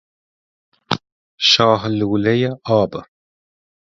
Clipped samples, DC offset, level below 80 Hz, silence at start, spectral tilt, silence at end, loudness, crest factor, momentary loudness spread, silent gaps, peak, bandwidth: under 0.1%; under 0.1%; -52 dBFS; 0.9 s; -5 dB/octave; 0.85 s; -17 LUFS; 20 dB; 12 LU; 1.12-1.38 s; 0 dBFS; 7.6 kHz